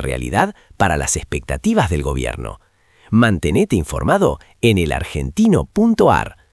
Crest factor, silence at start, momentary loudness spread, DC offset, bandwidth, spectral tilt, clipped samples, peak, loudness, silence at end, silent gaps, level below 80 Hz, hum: 16 dB; 0 s; 8 LU; under 0.1%; 12 kHz; -5.5 dB/octave; under 0.1%; 0 dBFS; -17 LUFS; 0.2 s; none; -32 dBFS; none